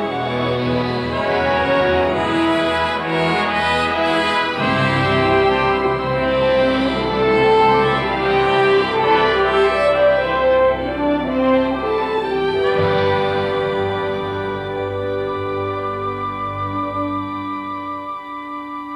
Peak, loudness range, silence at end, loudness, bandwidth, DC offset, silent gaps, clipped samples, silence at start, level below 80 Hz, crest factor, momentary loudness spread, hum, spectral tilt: -4 dBFS; 8 LU; 0 s; -18 LUFS; 11.5 kHz; under 0.1%; none; under 0.1%; 0 s; -40 dBFS; 14 dB; 9 LU; none; -6.5 dB/octave